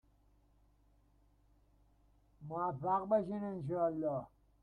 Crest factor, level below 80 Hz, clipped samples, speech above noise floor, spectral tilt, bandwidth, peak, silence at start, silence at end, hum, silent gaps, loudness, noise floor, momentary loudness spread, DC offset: 20 dB; -70 dBFS; under 0.1%; 34 dB; -10.5 dB/octave; 9 kHz; -20 dBFS; 2.4 s; 0.35 s; none; none; -37 LUFS; -70 dBFS; 10 LU; under 0.1%